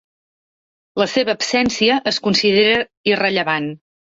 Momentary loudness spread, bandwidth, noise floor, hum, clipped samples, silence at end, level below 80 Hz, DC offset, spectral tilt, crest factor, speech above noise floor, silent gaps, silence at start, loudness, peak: 8 LU; 8 kHz; under -90 dBFS; none; under 0.1%; 0.4 s; -54 dBFS; under 0.1%; -3.5 dB/octave; 16 dB; over 73 dB; 2.97-3.04 s; 0.95 s; -17 LUFS; -4 dBFS